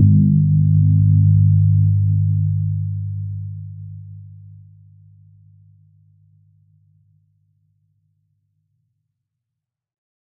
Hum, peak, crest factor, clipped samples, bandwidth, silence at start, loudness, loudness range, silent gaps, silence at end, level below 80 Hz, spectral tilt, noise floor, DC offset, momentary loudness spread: none; -2 dBFS; 16 dB; under 0.1%; 0.4 kHz; 0 s; -16 LUFS; 23 LU; none; 6 s; -46 dBFS; -29.5 dB/octave; -83 dBFS; under 0.1%; 21 LU